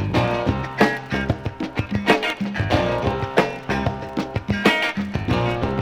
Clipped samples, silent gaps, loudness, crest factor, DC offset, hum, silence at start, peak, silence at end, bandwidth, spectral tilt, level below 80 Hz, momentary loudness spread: under 0.1%; none; -22 LUFS; 20 dB; under 0.1%; none; 0 s; -2 dBFS; 0 s; 16.5 kHz; -6 dB/octave; -38 dBFS; 7 LU